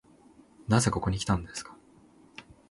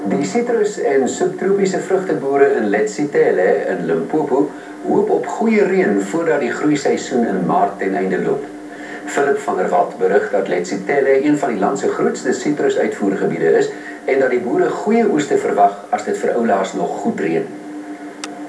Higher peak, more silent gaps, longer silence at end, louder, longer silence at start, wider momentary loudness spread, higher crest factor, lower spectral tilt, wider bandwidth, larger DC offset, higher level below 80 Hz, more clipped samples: second, -10 dBFS vs 0 dBFS; neither; first, 0.3 s vs 0 s; second, -29 LUFS vs -17 LUFS; first, 0.7 s vs 0 s; first, 24 LU vs 8 LU; first, 22 dB vs 16 dB; about the same, -5 dB/octave vs -5.5 dB/octave; about the same, 11.5 kHz vs 11 kHz; neither; first, -48 dBFS vs -64 dBFS; neither